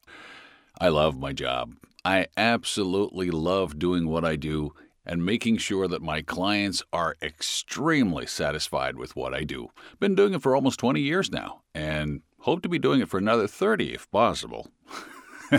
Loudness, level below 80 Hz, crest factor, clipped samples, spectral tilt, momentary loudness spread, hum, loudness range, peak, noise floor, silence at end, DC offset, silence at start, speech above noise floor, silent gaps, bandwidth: -26 LUFS; -50 dBFS; 20 dB; under 0.1%; -5 dB/octave; 14 LU; none; 2 LU; -6 dBFS; -50 dBFS; 0 s; under 0.1%; 0.1 s; 24 dB; none; 16 kHz